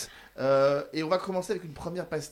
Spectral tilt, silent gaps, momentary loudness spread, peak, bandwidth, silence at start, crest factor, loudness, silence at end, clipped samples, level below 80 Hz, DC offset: -5 dB/octave; none; 12 LU; -12 dBFS; 16 kHz; 0 s; 16 dB; -29 LUFS; 0 s; under 0.1%; -60 dBFS; under 0.1%